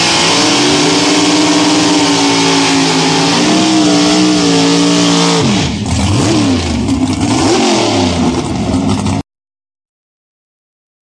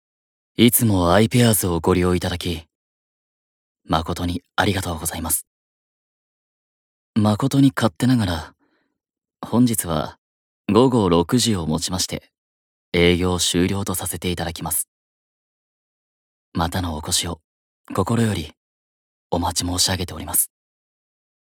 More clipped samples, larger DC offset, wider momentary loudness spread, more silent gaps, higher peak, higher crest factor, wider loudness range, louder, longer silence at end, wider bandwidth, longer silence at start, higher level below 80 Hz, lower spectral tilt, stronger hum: neither; neither; second, 5 LU vs 11 LU; second, none vs 2.75-3.75 s, 5.47-7.13 s, 10.18-10.64 s, 12.38-12.92 s, 14.88-16.52 s, 17.44-17.84 s, 18.57-19.30 s; about the same, 0 dBFS vs -2 dBFS; second, 10 dB vs 20 dB; about the same, 5 LU vs 6 LU; first, -10 LUFS vs -20 LUFS; first, 1.85 s vs 1.05 s; second, 11 kHz vs over 20 kHz; second, 0 s vs 0.6 s; first, -32 dBFS vs -44 dBFS; about the same, -3.5 dB/octave vs -4.5 dB/octave; neither